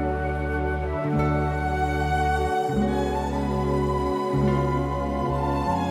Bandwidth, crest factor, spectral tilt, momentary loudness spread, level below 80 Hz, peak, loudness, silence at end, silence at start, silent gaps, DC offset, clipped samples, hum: 14.5 kHz; 12 dB; -7.5 dB/octave; 3 LU; -32 dBFS; -12 dBFS; -25 LUFS; 0 s; 0 s; none; under 0.1%; under 0.1%; none